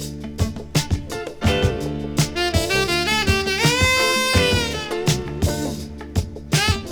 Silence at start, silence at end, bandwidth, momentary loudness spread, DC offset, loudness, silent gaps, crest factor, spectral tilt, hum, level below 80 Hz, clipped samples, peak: 0 s; 0 s; over 20 kHz; 10 LU; under 0.1%; -20 LUFS; none; 18 dB; -4 dB/octave; none; -32 dBFS; under 0.1%; -2 dBFS